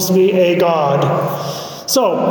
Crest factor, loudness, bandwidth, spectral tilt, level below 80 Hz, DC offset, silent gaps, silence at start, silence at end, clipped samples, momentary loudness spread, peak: 10 dB; -15 LUFS; 19.5 kHz; -5 dB/octave; -62 dBFS; under 0.1%; none; 0 s; 0 s; under 0.1%; 10 LU; -4 dBFS